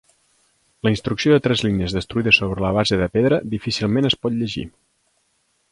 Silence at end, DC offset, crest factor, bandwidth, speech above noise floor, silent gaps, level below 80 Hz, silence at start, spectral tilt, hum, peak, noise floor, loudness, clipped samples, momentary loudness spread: 1 s; under 0.1%; 20 dB; 11.5 kHz; 47 dB; none; -42 dBFS; 0.85 s; -5.5 dB/octave; none; -2 dBFS; -66 dBFS; -19 LUFS; under 0.1%; 9 LU